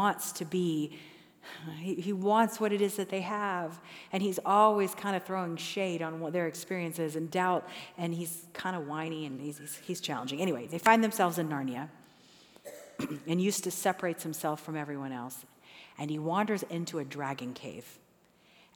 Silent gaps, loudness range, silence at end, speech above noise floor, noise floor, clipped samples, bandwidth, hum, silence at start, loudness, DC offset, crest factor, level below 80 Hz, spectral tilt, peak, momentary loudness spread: none; 6 LU; 0.8 s; 32 dB; -64 dBFS; under 0.1%; over 20 kHz; none; 0 s; -32 LUFS; under 0.1%; 24 dB; -82 dBFS; -4.5 dB/octave; -8 dBFS; 17 LU